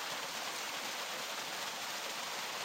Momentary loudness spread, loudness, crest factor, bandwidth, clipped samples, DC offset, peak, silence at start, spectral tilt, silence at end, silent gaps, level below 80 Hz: 0 LU; -39 LUFS; 14 dB; 16 kHz; under 0.1%; under 0.1%; -28 dBFS; 0 s; 0 dB/octave; 0 s; none; -84 dBFS